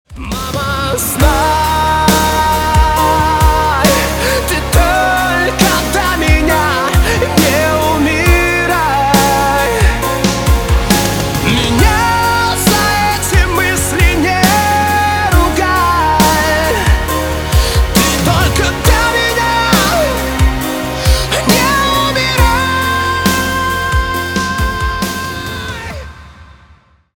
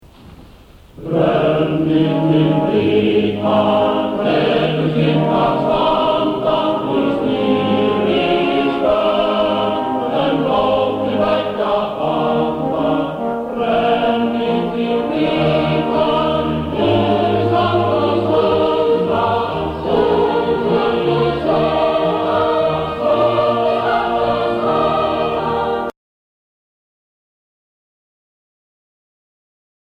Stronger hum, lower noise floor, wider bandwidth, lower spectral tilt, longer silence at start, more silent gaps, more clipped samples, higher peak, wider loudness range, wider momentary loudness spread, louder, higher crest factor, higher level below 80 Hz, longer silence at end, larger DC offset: neither; first, -46 dBFS vs -42 dBFS; first, over 20 kHz vs 10 kHz; second, -4 dB/octave vs -8 dB/octave; about the same, 0.1 s vs 0.2 s; neither; neither; about the same, 0 dBFS vs -2 dBFS; about the same, 2 LU vs 3 LU; about the same, 6 LU vs 4 LU; first, -12 LUFS vs -16 LUFS; about the same, 12 dB vs 14 dB; first, -20 dBFS vs -42 dBFS; second, 0.7 s vs 4 s; neither